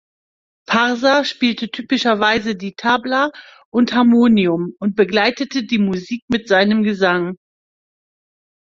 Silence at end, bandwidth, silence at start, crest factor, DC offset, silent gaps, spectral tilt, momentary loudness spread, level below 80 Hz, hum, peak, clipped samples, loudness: 1.3 s; 7.4 kHz; 0.7 s; 16 dB; under 0.1%; 3.65-3.72 s, 6.22-6.28 s; -5.5 dB/octave; 9 LU; -56 dBFS; none; 0 dBFS; under 0.1%; -17 LUFS